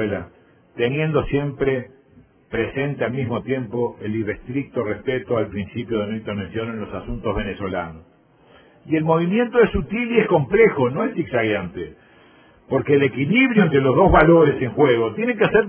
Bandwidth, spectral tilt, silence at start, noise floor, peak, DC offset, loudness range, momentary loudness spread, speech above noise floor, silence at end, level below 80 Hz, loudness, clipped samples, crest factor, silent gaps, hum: 4 kHz; -11 dB/octave; 0 s; -52 dBFS; 0 dBFS; under 0.1%; 9 LU; 12 LU; 33 dB; 0 s; -40 dBFS; -20 LUFS; under 0.1%; 20 dB; none; none